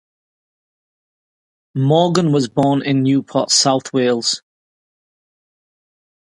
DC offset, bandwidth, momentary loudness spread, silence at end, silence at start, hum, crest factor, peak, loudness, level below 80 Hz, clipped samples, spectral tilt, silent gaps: under 0.1%; 11.5 kHz; 7 LU; 1.95 s; 1.75 s; none; 18 dB; 0 dBFS; -16 LUFS; -62 dBFS; under 0.1%; -4.5 dB/octave; none